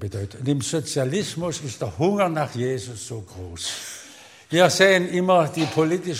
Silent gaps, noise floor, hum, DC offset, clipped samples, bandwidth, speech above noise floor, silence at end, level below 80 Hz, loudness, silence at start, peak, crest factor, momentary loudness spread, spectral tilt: none; -46 dBFS; none; under 0.1%; under 0.1%; 16 kHz; 24 dB; 0 s; -60 dBFS; -22 LUFS; 0 s; 0 dBFS; 22 dB; 17 LU; -4.5 dB/octave